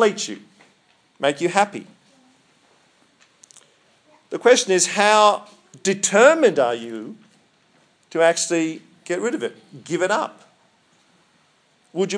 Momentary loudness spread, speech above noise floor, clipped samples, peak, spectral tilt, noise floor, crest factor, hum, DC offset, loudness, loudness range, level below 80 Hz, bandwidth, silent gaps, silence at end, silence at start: 19 LU; 42 dB; under 0.1%; 0 dBFS; -2.5 dB/octave; -60 dBFS; 22 dB; none; under 0.1%; -19 LUFS; 10 LU; -80 dBFS; 10.5 kHz; none; 0 s; 0 s